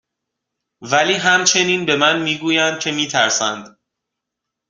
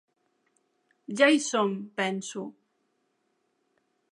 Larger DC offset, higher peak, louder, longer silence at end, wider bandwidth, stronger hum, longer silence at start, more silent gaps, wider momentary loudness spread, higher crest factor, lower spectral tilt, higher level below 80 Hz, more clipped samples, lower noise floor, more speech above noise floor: neither; first, 0 dBFS vs -8 dBFS; first, -15 LUFS vs -26 LUFS; second, 1 s vs 1.6 s; about the same, 10.5 kHz vs 11.5 kHz; neither; second, 0.8 s vs 1.1 s; neither; second, 6 LU vs 17 LU; second, 18 dB vs 24 dB; second, -2 dB/octave vs -3.5 dB/octave; first, -62 dBFS vs -88 dBFS; neither; first, -81 dBFS vs -75 dBFS; first, 64 dB vs 49 dB